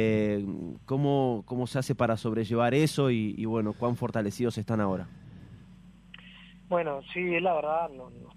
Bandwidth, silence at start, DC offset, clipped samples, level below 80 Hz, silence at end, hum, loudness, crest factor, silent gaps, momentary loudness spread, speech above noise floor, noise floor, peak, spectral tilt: 14.5 kHz; 0 s; under 0.1%; under 0.1%; -60 dBFS; 0.05 s; none; -29 LUFS; 18 dB; none; 20 LU; 24 dB; -52 dBFS; -12 dBFS; -7 dB/octave